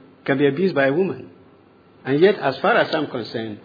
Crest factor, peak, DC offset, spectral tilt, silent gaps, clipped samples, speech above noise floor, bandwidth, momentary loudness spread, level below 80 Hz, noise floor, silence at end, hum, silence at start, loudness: 18 dB; -4 dBFS; under 0.1%; -8 dB/octave; none; under 0.1%; 32 dB; 5 kHz; 11 LU; -70 dBFS; -51 dBFS; 0.1 s; none; 0.25 s; -20 LUFS